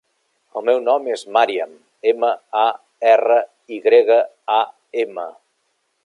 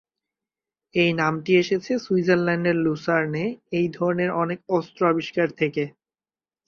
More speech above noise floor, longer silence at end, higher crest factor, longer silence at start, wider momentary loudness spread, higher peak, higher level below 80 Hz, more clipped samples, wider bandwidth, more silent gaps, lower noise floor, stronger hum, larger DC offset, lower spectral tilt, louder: second, 52 dB vs over 68 dB; about the same, 0.75 s vs 0.8 s; about the same, 16 dB vs 18 dB; second, 0.55 s vs 0.95 s; first, 12 LU vs 6 LU; first, -2 dBFS vs -6 dBFS; second, -80 dBFS vs -64 dBFS; neither; first, 10.5 kHz vs 7 kHz; neither; second, -69 dBFS vs under -90 dBFS; neither; neither; second, -3 dB/octave vs -7 dB/octave; first, -18 LUFS vs -23 LUFS